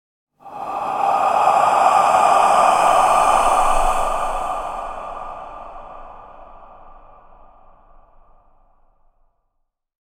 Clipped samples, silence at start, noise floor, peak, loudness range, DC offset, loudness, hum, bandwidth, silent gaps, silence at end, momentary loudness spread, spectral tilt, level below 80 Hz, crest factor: under 0.1%; 0.45 s; -71 dBFS; -2 dBFS; 20 LU; under 0.1%; -16 LUFS; none; 16.5 kHz; none; 3.2 s; 22 LU; -2.5 dB/octave; -36 dBFS; 18 dB